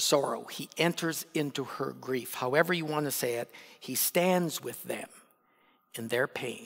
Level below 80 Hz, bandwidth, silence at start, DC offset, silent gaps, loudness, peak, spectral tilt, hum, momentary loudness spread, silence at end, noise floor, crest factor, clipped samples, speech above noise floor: -86 dBFS; 16.5 kHz; 0 s; under 0.1%; none; -31 LUFS; -10 dBFS; -3.5 dB/octave; none; 13 LU; 0 s; -68 dBFS; 22 dB; under 0.1%; 36 dB